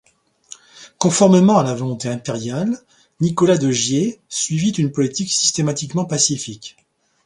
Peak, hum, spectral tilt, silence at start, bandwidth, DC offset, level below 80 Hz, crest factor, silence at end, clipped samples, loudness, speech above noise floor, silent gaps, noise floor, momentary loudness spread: 0 dBFS; none; -4.5 dB/octave; 0.75 s; 11 kHz; under 0.1%; -58 dBFS; 18 dB; 0.55 s; under 0.1%; -18 LUFS; 27 dB; none; -44 dBFS; 12 LU